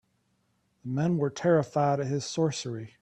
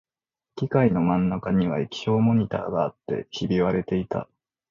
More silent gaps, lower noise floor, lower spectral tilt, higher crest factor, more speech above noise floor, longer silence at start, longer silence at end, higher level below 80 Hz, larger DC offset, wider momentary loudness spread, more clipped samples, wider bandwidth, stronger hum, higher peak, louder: neither; second, -72 dBFS vs -89 dBFS; second, -6 dB/octave vs -8 dB/octave; about the same, 18 dB vs 16 dB; second, 45 dB vs 66 dB; first, 0.85 s vs 0.55 s; second, 0.15 s vs 0.45 s; second, -66 dBFS vs -52 dBFS; neither; about the same, 10 LU vs 10 LU; neither; first, 9.6 kHz vs 7.2 kHz; neither; second, -12 dBFS vs -8 dBFS; second, -28 LUFS vs -24 LUFS